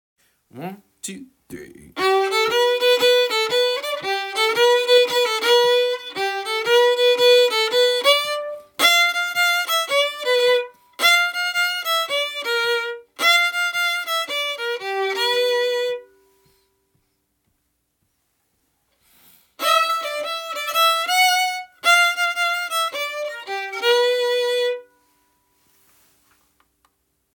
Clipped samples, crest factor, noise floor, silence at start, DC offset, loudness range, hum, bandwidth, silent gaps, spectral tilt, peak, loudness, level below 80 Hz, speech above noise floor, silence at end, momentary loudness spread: under 0.1%; 18 dB; -71 dBFS; 0.55 s; under 0.1%; 8 LU; none; 19 kHz; none; 0 dB/octave; -4 dBFS; -18 LUFS; -70 dBFS; 36 dB; 2.55 s; 13 LU